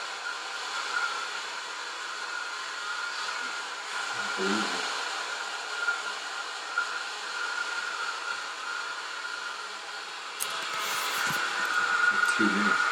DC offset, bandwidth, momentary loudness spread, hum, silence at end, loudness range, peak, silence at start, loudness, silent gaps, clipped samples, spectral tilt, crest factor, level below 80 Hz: under 0.1%; 17 kHz; 10 LU; none; 0 s; 5 LU; -10 dBFS; 0 s; -30 LUFS; none; under 0.1%; -1.5 dB/octave; 22 dB; -84 dBFS